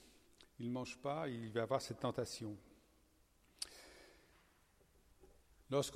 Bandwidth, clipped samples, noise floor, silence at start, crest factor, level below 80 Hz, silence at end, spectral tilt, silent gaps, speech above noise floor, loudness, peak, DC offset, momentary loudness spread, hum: 16.5 kHz; under 0.1%; -72 dBFS; 0 s; 24 dB; -72 dBFS; 0 s; -5 dB/octave; none; 31 dB; -44 LUFS; -22 dBFS; under 0.1%; 20 LU; none